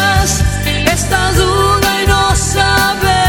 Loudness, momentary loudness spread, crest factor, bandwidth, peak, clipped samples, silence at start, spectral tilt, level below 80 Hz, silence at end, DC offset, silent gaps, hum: -12 LUFS; 2 LU; 12 dB; 17.5 kHz; 0 dBFS; under 0.1%; 0 s; -3.5 dB/octave; -20 dBFS; 0 s; under 0.1%; none; none